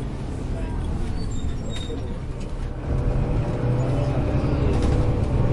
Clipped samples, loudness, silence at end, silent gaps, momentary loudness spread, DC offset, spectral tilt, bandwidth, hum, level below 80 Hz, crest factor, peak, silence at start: under 0.1%; -26 LUFS; 0 s; none; 9 LU; under 0.1%; -8 dB/octave; 11 kHz; none; -28 dBFS; 14 dB; -8 dBFS; 0 s